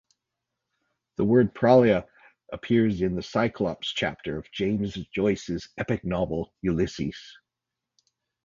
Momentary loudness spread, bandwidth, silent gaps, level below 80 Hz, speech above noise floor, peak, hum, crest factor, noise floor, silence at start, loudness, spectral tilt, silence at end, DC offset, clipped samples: 14 LU; 7.6 kHz; none; -50 dBFS; 62 dB; -4 dBFS; none; 22 dB; -87 dBFS; 1.2 s; -25 LUFS; -7 dB/octave; 1.15 s; under 0.1%; under 0.1%